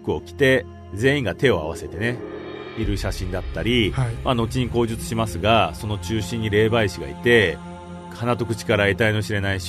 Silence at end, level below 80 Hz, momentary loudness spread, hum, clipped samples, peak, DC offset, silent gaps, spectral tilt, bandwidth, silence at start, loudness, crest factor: 0 s; -38 dBFS; 12 LU; none; under 0.1%; -4 dBFS; under 0.1%; none; -5.5 dB/octave; 13.5 kHz; 0 s; -22 LUFS; 18 dB